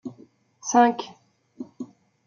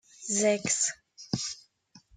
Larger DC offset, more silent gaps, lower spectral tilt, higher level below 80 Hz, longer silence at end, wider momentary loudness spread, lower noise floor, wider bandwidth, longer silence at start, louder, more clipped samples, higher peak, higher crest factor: neither; neither; about the same, -3.5 dB/octave vs -2.5 dB/octave; second, -80 dBFS vs -68 dBFS; first, 0.4 s vs 0.2 s; first, 23 LU vs 15 LU; second, -54 dBFS vs -60 dBFS; second, 7.4 kHz vs 10.5 kHz; second, 0.05 s vs 0.2 s; first, -22 LUFS vs -28 LUFS; neither; first, -4 dBFS vs -14 dBFS; about the same, 22 dB vs 18 dB